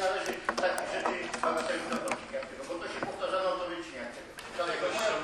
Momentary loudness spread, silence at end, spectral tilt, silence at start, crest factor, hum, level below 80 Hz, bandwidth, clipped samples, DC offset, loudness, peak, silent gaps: 9 LU; 0 s; -2.5 dB/octave; 0 s; 20 dB; none; -64 dBFS; 13 kHz; under 0.1%; under 0.1%; -33 LUFS; -12 dBFS; none